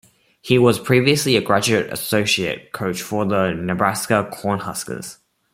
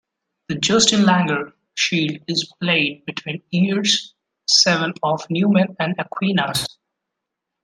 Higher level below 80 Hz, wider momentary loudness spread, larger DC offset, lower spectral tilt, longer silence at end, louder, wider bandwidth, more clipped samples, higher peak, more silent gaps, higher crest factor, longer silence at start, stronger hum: about the same, -56 dBFS vs -60 dBFS; about the same, 11 LU vs 13 LU; neither; about the same, -4.5 dB/octave vs -3.5 dB/octave; second, 0.4 s vs 0.95 s; about the same, -19 LUFS vs -18 LUFS; first, 16.5 kHz vs 13.5 kHz; neither; about the same, -2 dBFS vs 0 dBFS; neither; about the same, 18 dB vs 20 dB; about the same, 0.45 s vs 0.5 s; neither